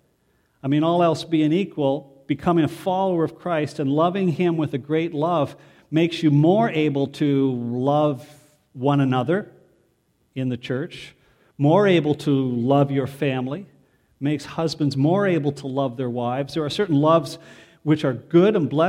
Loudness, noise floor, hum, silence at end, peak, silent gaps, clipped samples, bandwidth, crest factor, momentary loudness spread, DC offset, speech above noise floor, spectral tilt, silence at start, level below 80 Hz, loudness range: -21 LUFS; -65 dBFS; none; 0 s; -4 dBFS; none; under 0.1%; 12.5 kHz; 18 dB; 11 LU; under 0.1%; 45 dB; -7.5 dB/octave; 0.65 s; -62 dBFS; 3 LU